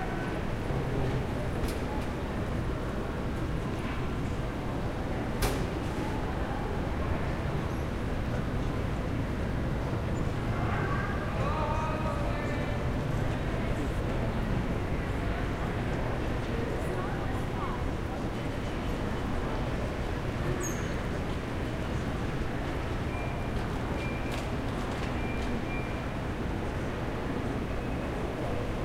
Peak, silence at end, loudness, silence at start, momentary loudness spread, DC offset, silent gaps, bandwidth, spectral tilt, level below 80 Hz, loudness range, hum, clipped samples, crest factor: -14 dBFS; 0 s; -33 LUFS; 0 s; 3 LU; under 0.1%; none; 16 kHz; -6.5 dB/octave; -36 dBFS; 2 LU; none; under 0.1%; 16 dB